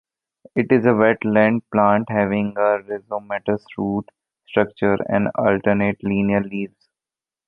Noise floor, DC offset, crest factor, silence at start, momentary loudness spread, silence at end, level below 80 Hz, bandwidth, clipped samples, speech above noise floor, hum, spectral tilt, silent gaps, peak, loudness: under -90 dBFS; under 0.1%; 18 dB; 0.55 s; 10 LU; 0.8 s; -54 dBFS; 4.3 kHz; under 0.1%; over 71 dB; none; -10 dB/octave; none; -2 dBFS; -20 LUFS